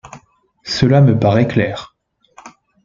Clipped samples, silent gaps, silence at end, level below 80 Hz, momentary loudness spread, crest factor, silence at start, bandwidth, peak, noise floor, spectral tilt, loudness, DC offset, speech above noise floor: under 0.1%; none; 0.35 s; -46 dBFS; 16 LU; 14 dB; 0.05 s; 7.4 kHz; -2 dBFS; -50 dBFS; -7 dB/octave; -14 LUFS; under 0.1%; 38 dB